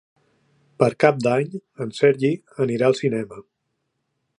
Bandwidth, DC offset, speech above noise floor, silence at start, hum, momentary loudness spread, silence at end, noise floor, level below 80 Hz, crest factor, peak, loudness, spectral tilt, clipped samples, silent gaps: 10.5 kHz; under 0.1%; 55 dB; 0.8 s; none; 13 LU; 1 s; -75 dBFS; -68 dBFS; 22 dB; 0 dBFS; -21 LUFS; -6.5 dB/octave; under 0.1%; none